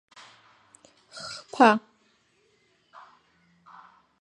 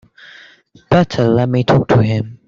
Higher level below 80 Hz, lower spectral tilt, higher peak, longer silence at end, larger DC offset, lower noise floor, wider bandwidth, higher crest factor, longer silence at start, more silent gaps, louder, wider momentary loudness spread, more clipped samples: second, -80 dBFS vs -44 dBFS; second, -4.5 dB/octave vs -8 dB/octave; second, -4 dBFS vs 0 dBFS; first, 2.45 s vs 0.1 s; neither; first, -67 dBFS vs -46 dBFS; first, 11 kHz vs 7.4 kHz; first, 26 dB vs 14 dB; first, 1.2 s vs 0.9 s; neither; second, -23 LUFS vs -14 LUFS; first, 22 LU vs 3 LU; neither